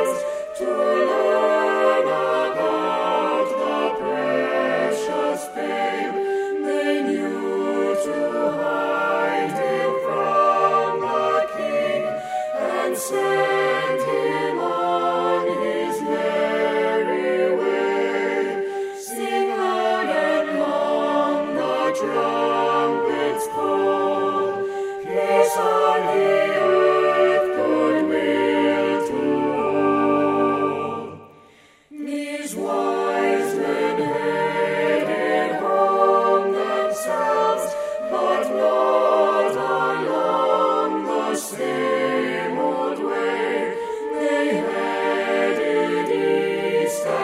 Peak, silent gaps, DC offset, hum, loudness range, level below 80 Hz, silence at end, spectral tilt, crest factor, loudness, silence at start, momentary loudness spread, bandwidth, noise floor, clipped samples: -4 dBFS; none; under 0.1%; none; 4 LU; -64 dBFS; 0 s; -4.5 dB/octave; 16 dB; -21 LUFS; 0 s; 6 LU; 15.5 kHz; -52 dBFS; under 0.1%